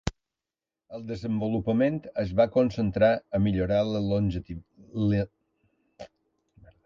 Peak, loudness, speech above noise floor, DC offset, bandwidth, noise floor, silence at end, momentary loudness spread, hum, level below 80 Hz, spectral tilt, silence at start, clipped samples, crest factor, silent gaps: -8 dBFS; -27 LUFS; over 64 dB; under 0.1%; 7.6 kHz; under -90 dBFS; 0.8 s; 14 LU; none; -48 dBFS; -8 dB/octave; 0.05 s; under 0.1%; 20 dB; none